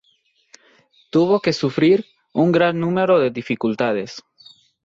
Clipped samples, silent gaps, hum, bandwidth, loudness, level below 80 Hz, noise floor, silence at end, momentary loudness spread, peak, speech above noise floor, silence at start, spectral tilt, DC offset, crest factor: under 0.1%; none; none; 7.8 kHz; -19 LUFS; -62 dBFS; -62 dBFS; 0.65 s; 9 LU; -4 dBFS; 45 dB; 1.15 s; -7 dB/octave; under 0.1%; 16 dB